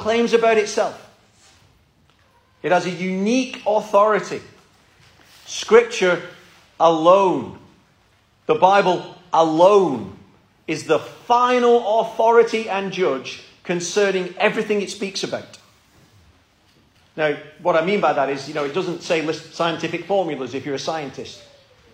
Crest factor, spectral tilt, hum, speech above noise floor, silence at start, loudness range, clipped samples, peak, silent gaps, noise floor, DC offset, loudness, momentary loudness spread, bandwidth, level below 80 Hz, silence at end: 20 dB; -4.5 dB/octave; none; 40 dB; 0 s; 6 LU; under 0.1%; 0 dBFS; none; -58 dBFS; under 0.1%; -19 LUFS; 14 LU; 11 kHz; -64 dBFS; 0.55 s